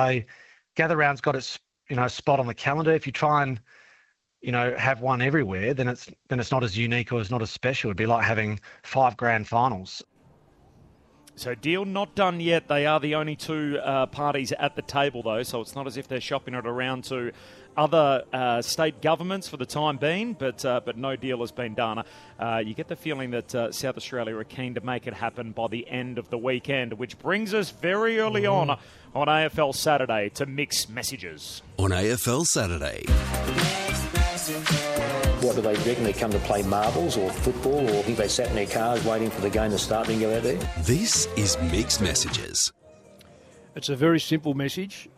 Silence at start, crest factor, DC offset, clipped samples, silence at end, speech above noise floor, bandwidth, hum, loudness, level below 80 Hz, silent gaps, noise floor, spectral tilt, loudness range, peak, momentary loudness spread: 0 s; 20 dB; under 0.1%; under 0.1%; 0.1 s; 37 dB; 15 kHz; none; -26 LUFS; -40 dBFS; none; -63 dBFS; -4 dB/octave; 5 LU; -6 dBFS; 10 LU